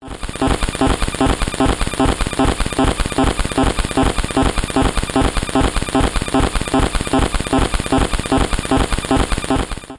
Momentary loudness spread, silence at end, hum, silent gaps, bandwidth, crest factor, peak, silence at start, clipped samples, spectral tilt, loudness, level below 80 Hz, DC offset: 0 LU; 0 s; none; none; 11.5 kHz; 14 dB; -2 dBFS; 0 s; under 0.1%; -5 dB/octave; -18 LUFS; -22 dBFS; under 0.1%